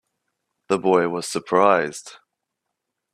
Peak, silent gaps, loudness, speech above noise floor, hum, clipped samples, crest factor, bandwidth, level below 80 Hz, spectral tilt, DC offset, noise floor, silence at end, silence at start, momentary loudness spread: -2 dBFS; none; -20 LUFS; 61 dB; none; under 0.1%; 22 dB; 14 kHz; -68 dBFS; -4.5 dB/octave; under 0.1%; -81 dBFS; 1 s; 0.7 s; 11 LU